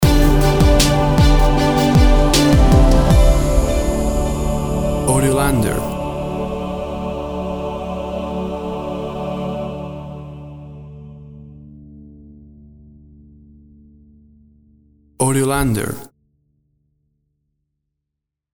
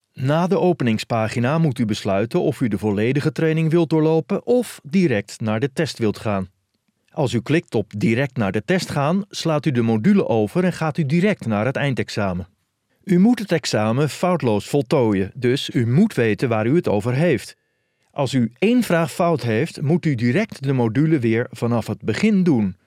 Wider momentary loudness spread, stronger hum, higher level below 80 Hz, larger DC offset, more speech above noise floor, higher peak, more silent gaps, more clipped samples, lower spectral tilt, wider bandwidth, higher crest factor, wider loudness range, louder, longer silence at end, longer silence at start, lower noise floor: first, 19 LU vs 6 LU; neither; first, -20 dBFS vs -62 dBFS; neither; first, 64 dB vs 50 dB; about the same, -2 dBFS vs -4 dBFS; neither; neither; second, -5.5 dB/octave vs -7 dB/octave; first, over 20 kHz vs 15 kHz; about the same, 16 dB vs 14 dB; first, 16 LU vs 3 LU; first, -17 LUFS vs -20 LUFS; first, 2.5 s vs 0.15 s; second, 0 s vs 0.15 s; first, -81 dBFS vs -69 dBFS